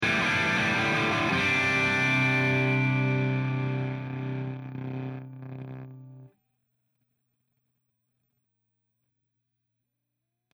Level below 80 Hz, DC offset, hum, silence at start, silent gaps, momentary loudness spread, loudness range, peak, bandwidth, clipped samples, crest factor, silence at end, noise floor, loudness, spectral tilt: -62 dBFS; under 0.1%; 60 Hz at -75 dBFS; 0 s; none; 18 LU; 20 LU; -14 dBFS; 11.5 kHz; under 0.1%; 16 dB; 4.3 s; -83 dBFS; -25 LUFS; -5.5 dB/octave